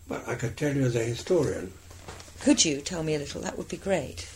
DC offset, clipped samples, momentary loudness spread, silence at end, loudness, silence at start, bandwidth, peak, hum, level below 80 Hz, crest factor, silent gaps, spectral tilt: under 0.1%; under 0.1%; 20 LU; 0 s; -28 LUFS; 0 s; 16 kHz; -6 dBFS; none; -52 dBFS; 22 dB; none; -4 dB/octave